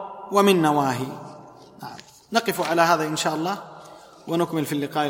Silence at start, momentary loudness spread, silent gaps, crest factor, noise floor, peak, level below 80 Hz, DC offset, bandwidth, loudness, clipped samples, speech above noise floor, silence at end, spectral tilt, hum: 0 s; 23 LU; none; 20 dB; -45 dBFS; -4 dBFS; -68 dBFS; under 0.1%; 17 kHz; -22 LUFS; under 0.1%; 23 dB; 0 s; -4.5 dB/octave; none